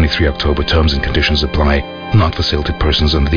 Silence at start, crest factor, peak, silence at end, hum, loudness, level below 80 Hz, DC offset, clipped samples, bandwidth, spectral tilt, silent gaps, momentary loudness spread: 0 s; 12 dB; -2 dBFS; 0 s; none; -14 LUFS; -18 dBFS; under 0.1%; under 0.1%; 5.4 kHz; -6.5 dB/octave; none; 3 LU